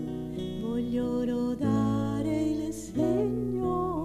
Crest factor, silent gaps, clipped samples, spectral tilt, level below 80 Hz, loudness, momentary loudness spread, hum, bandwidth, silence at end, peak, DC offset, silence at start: 14 dB; none; under 0.1%; -7.5 dB/octave; -48 dBFS; -29 LUFS; 7 LU; none; 14 kHz; 0 s; -16 dBFS; under 0.1%; 0 s